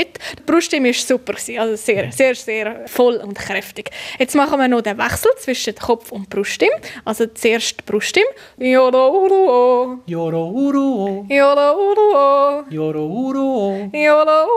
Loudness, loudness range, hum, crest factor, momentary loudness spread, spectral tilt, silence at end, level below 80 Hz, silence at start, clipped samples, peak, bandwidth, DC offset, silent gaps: -16 LUFS; 4 LU; none; 14 dB; 10 LU; -4 dB/octave; 0 s; -54 dBFS; 0 s; under 0.1%; -2 dBFS; 15.5 kHz; under 0.1%; none